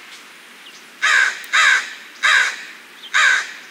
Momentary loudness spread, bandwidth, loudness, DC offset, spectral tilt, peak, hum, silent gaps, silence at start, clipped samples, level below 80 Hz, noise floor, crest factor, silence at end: 18 LU; 16 kHz; -15 LUFS; under 0.1%; 3 dB/octave; -2 dBFS; none; none; 0.05 s; under 0.1%; -74 dBFS; -41 dBFS; 18 dB; 0.05 s